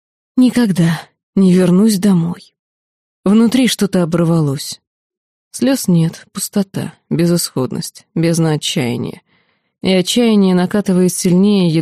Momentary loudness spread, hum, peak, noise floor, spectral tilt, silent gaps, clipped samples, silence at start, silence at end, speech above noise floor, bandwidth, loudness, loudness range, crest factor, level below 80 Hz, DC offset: 12 LU; none; -2 dBFS; -59 dBFS; -6 dB/octave; 1.23-1.33 s, 2.59-3.23 s, 4.87-5.10 s, 5.17-5.51 s; under 0.1%; 0.35 s; 0 s; 46 dB; 15.5 kHz; -14 LUFS; 4 LU; 14 dB; -54 dBFS; under 0.1%